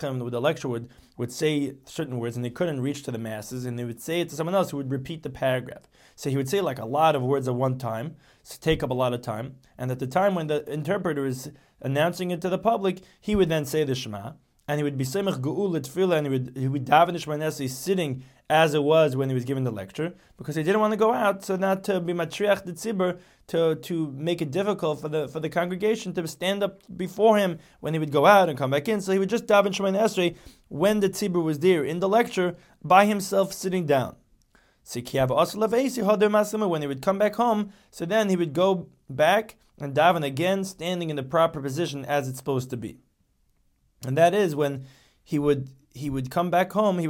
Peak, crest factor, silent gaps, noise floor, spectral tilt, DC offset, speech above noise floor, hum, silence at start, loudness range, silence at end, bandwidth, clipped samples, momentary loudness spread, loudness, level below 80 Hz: -4 dBFS; 22 dB; none; -67 dBFS; -5.5 dB/octave; under 0.1%; 43 dB; none; 0 s; 5 LU; 0 s; 17 kHz; under 0.1%; 13 LU; -25 LUFS; -56 dBFS